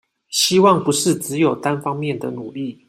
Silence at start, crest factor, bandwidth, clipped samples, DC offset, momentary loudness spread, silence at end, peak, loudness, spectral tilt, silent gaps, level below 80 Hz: 0.3 s; 16 dB; 16 kHz; under 0.1%; under 0.1%; 14 LU; 0.15 s; -2 dBFS; -18 LUFS; -4 dB/octave; none; -62 dBFS